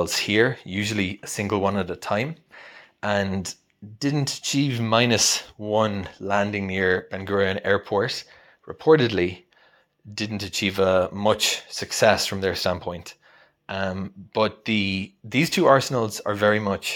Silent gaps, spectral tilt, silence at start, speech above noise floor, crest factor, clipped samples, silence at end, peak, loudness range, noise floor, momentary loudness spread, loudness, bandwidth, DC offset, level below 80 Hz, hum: none; -4 dB/octave; 0 s; 36 dB; 22 dB; under 0.1%; 0 s; 0 dBFS; 4 LU; -59 dBFS; 12 LU; -23 LUFS; 17.5 kHz; under 0.1%; -58 dBFS; none